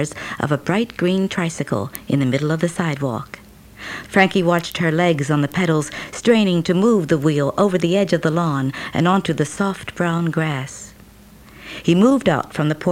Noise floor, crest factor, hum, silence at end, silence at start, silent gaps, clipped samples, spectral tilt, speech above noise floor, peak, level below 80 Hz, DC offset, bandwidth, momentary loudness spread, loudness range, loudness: -44 dBFS; 18 dB; none; 0 s; 0 s; none; under 0.1%; -6 dB/octave; 26 dB; 0 dBFS; -52 dBFS; under 0.1%; 16.5 kHz; 11 LU; 4 LU; -19 LUFS